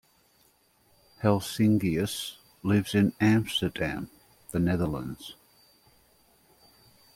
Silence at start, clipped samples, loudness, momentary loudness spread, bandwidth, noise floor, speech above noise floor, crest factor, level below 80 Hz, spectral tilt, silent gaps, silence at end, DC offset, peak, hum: 1.2 s; under 0.1%; -28 LUFS; 15 LU; 16.5 kHz; -65 dBFS; 39 dB; 20 dB; -54 dBFS; -6 dB/octave; none; 1.85 s; under 0.1%; -8 dBFS; none